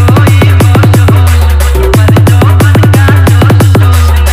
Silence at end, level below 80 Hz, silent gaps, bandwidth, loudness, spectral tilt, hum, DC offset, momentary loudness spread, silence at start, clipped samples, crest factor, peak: 0 s; -12 dBFS; none; 16 kHz; -5 LUFS; -6.5 dB/octave; none; under 0.1%; 2 LU; 0 s; 3%; 4 dB; 0 dBFS